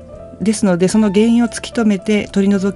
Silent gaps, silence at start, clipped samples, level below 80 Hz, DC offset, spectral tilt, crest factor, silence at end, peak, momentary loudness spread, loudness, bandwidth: none; 0 s; under 0.1%; -44 dBFS; under 0.1%; -6 dB/octave; 12 dB; 0 s; -2 dBFS; 6 LU; -15 LUFS; 11.5 kHz